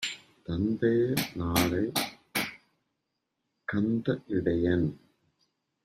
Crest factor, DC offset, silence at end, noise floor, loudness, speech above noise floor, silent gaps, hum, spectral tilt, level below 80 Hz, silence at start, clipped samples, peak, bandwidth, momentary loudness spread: 20 dB; under 0.1%; 0.9 s; -82 dBFS; -29 LUFS; 55 dB; none; none; -5 dB/octave; -56 dBFS; 0 s; under 0.1%; -10 dBFS; 16 kHz; 9 LU